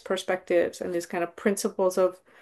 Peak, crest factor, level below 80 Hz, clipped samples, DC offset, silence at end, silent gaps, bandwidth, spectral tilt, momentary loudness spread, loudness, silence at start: -10 dBFS; 18 dB; -68 dBFS; under 0.1%; under 0.1%; 0.25 s; none; 12.5 kHz; -4.5 dB/octave; 6 LU; -27 LUFS; 0.05 s